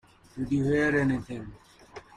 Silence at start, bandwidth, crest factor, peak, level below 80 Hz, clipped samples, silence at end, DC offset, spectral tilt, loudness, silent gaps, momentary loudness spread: 0.35 s; 10.5 kHz; 16 dB; -14 dBFS; -52 dBFS; under 0.1%; 0.15 s; under 0.1%; -7.5 dB/octave; -27 LUFS; none; 23 LU